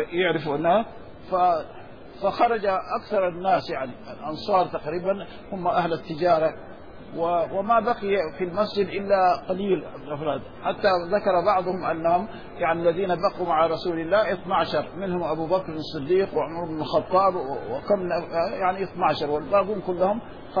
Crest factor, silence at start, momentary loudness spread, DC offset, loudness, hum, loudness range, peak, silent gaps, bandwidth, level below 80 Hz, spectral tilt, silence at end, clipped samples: 16 dB; 0 s; 10 LU; 0.5%; -24 LUFS; none; 2 LU; -8 dBFS; none; 5.4 kHz; -52 dBFS; -7.5 dB/octave; 0 s; under 0.1%